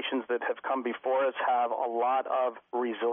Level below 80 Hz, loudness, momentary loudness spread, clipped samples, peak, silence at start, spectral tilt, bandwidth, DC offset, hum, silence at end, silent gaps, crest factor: -86 dBFS; -30 LUFS; 4 LU; under 0.1%; -18 dBFS; 0 s; -0.5 dB/octave; 3.7 kHz; under 0.1%; none; 0 s; none; 10 dB